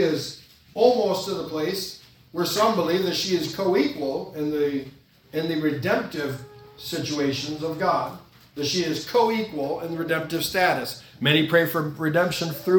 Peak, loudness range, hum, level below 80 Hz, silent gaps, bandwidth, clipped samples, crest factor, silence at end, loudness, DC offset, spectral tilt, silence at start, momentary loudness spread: -4 dBFS; 4 LU; none; -60 dBFS; none; 18 kHz; under 0.1%; 20 dB; 0 s; -24 LUFS; under 0.1%; -4.5 dB/octave; 0 s; 13 LU